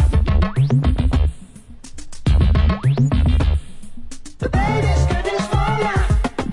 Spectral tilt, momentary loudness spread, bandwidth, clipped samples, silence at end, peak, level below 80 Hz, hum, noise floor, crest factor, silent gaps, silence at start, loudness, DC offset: -7 dB/octave; 10 LU; 11.5 kHz; under 0.1%; 0 s; -4 dBFS; -20 dBFS; none; -38 dBFS; 12 dB; none; 0 s; -18 LUFS; under 0.1%